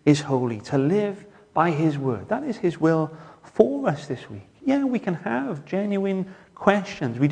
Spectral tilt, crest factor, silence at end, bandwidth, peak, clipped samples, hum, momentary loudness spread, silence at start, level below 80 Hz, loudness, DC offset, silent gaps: -7 dB/octave; 22 dB; 0 s; 10 kHz; -2 dBFS; under 0.1%; none; 11 LU; 0.05 s; -62 dBFS; -24 LUFS; under 0.1%; none